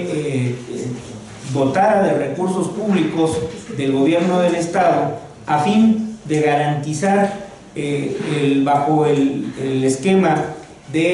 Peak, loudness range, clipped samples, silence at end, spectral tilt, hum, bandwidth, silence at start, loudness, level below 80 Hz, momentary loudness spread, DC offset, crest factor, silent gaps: -4 dBFS; 2 LU; under 0.1%; 0 s; -6.5 dB/octave; none; 11.5 kHz; 0 s; -18 LUFS; -54 dBFS; 12 LU; under 0.1%; 14 dB; none